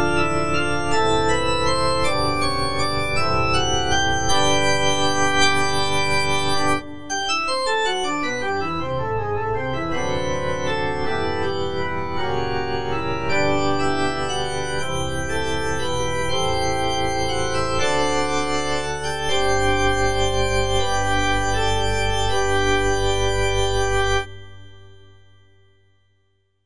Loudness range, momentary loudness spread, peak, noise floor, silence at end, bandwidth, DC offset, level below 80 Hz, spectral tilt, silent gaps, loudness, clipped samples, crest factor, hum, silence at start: 5 LU; 6 LU; -4 dBFS; -67 dBFS; 0 s; 10.5 kHz; 5%; -34 dBFS; -3.5 dB/octave; none; -21 LUFS; under 0.1%; 18 dB; none; 0 s